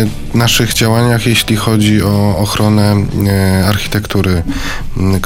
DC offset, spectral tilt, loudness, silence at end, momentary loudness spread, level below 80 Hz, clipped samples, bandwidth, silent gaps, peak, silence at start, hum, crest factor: 0.5%; -5 dB/octave; -12 LUFS; 0 s; 5 LU; -26 dBFS; under 0.1%; 17 kHz; none; 0 dBFS; 0 s; none; 12 dB